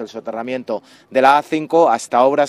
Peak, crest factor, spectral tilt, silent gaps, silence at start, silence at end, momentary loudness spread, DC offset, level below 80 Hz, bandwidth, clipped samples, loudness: 0 dBFS; 16 dB; -4.5 dB/octave; none; 0 s; 0 s; 14 LU; under 0.1%; -66 dBFS; 13 kHz; under 0.1%; -16 LUFS